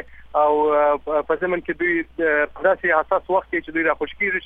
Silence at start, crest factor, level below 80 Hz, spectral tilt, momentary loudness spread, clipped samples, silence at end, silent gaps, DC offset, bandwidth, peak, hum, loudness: 0 s; 16 dB; -50 dBFS; -7.5 dB/octave; 5 LU; under 0.1%; 0 s; none; under 0.1%; 3.9 kHz; -4 dBFS; none; -20 LUFS